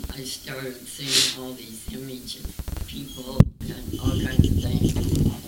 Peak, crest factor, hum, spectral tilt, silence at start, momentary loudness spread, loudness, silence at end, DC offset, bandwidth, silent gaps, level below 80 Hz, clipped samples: 0 dBFS; 24 dB; none; -4.5 dB/octave; 0 s; 15 LU; -25 LUFS; 0 s; under 0.1%; 19 kHz; none; -34 dBFS; under 0.1%